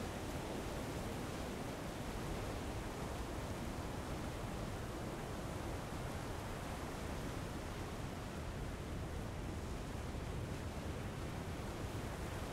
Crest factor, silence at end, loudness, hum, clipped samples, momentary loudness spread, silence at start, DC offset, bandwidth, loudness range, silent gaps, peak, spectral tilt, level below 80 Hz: 14 dB; 0 s; -45 LUFS; none; under 0.1%; 2 LU; 0 s; under 0.1%; 16 kHz; 1 LU; none; -30 dBFS; -5.5 dB/octave; -50 dBFS